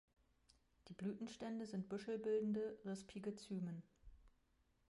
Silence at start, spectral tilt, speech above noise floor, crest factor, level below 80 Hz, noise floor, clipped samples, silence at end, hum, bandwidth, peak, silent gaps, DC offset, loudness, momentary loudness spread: 0.85 s; -7 dB/octave; 33 dB; 16 dB; -74 dBFS; -79 dBFS; under 0.1%; 0.65 s; none; 11.5 kHz; -32 dBFS; none; under 0.1%; -47 LUFS; 9 LU